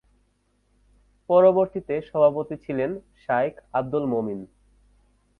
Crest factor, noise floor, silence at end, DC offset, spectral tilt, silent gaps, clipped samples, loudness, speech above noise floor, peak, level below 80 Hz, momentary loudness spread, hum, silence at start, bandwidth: 20 dB; -67 dBFS; 0.95 s; under 0.1%; -9.5 dB/octave; none; under 0.1%; -23 LUFS; 45 dB; -6 dBFS; -60 dBFS; 13 LU; 50 Hz at -60 dBFS; 1.3 s; 4.2 kHz